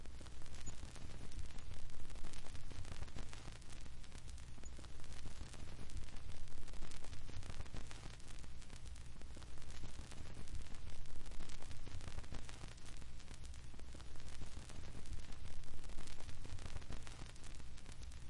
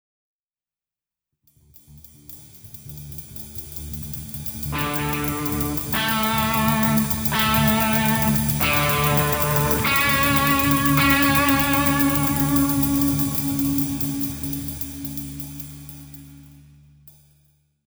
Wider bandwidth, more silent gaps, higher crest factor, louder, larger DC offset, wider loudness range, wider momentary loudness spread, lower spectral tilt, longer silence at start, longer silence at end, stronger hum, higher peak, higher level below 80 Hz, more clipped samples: second, 11 kHz vs over 20 kHz; neither; second, 10 dB vs 20 dB; second, -55 LUFS vs -20 LUFS; neither; second, 1 LU vs 16 LU; second, 4 LU vs 18 LU; about the same, -4 dB/octave vs -4.5 dB/octave; second, 0 s vs 1.9 s; second, 0 s vs 0.8 s; neither; second, -28 dBFS vs -2 dBFS; second, -50 dBFS vs -38 dBFS; neither